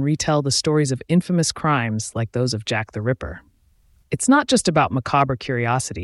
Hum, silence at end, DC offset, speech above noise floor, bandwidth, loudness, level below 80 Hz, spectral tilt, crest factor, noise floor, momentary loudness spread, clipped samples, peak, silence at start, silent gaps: none; 0 s; under 0.1%; 37 dB; 12 kHz; -20 LUFS; -48 dBFS; -5 dB/octave; 16 dB; -57 dBFS; 8 LU; under 0.1%; -4 dBFS; 0 s; none